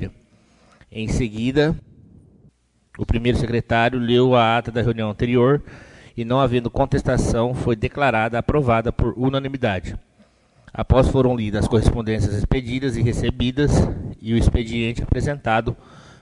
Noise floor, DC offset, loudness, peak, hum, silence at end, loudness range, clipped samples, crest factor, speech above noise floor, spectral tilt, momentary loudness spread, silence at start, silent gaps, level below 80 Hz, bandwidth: -56 dBFS; under 0.1%; -20 LUFS; 0 dBFS; none; 0.45 s; 3 LU; under 0.1%; 20 dB; 37 dB; -7 dB/octave; 11 LU; 0 s; none; -30 dBFS; 11 kHz